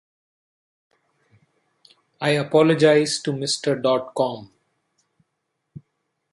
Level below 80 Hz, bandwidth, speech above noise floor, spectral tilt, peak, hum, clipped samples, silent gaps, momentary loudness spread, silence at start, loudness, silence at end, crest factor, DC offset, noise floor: -68 dBFS; 11.5 kHz; 57 dB; -4.5 dB/octave; -4 dBFS; none; under 0.1%; none; 10 LU; 2.2 s; -20 LUFS; 1.85 s; 20 dB; under 0.1%; -77 dBFS